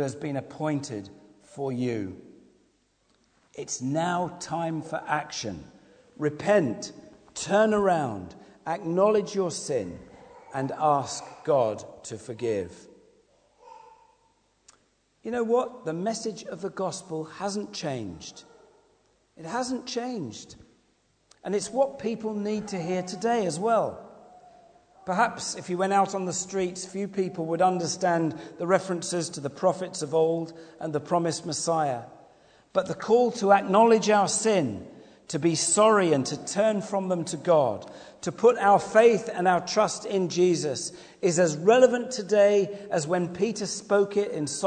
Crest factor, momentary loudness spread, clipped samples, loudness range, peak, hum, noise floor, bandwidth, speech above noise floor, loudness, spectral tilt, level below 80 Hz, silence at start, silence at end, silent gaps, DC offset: 22 dB; 15 LU; under 0.1%; 11 LU; -4 dBFS; none; -68 dBFS; 9.4 kHz; 42 dB; -26 LUFS; -4.5 dB/octave; -66 dBFS; 0 s; 0 s; none; under 0.1%